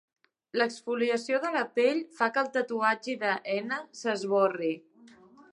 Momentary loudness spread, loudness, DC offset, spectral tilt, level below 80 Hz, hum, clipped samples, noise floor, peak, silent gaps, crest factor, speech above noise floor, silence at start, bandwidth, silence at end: 7 LU; -29 LUFS; under 0.1%; -4 dB/octave; -86 dBFS; none; under 0.1%; -55 dBFS; -10 dBFS; none; 20 dB; 27 dB; 0.55 s; 11 kHz; 0.1 s